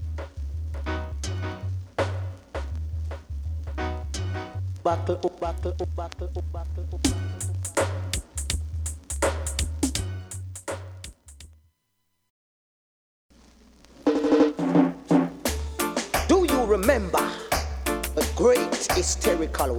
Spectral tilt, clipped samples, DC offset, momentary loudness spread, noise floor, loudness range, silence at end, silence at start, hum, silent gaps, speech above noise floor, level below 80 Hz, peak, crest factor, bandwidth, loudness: -5 dB/octave; under 0.1%; under 0.1%; 13 LU; -74 dBFS; 10 LU; 0 s; 0 s; none; 12.30-13.29 s; 49 dB; -36 dBFS; -8 dBFS; 20 dB; 19 kHz; -27 LUFS